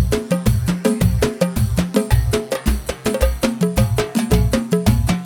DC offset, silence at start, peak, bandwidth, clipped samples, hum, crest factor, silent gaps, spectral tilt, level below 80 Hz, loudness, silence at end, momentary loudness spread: under 0.1%; 0 s; -2 dBFS; 18.5 kHz; under 0.1%; none; 16 dB; none; -6 dB/octave; -24 dBFS; -18 LUFS; 0 s; 4 LU